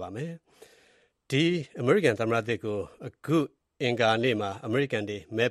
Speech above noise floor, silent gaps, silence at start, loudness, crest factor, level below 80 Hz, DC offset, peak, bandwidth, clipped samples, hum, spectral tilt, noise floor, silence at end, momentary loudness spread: 37 dB; none; 0 s; -28 LUFS; 18 dB; -66 dBFS; under 0.1%; -10 dBFS; 13 kHz; under 0.1%; none; -6 dB/octave; -64 dBFS; 0 s; 13 LU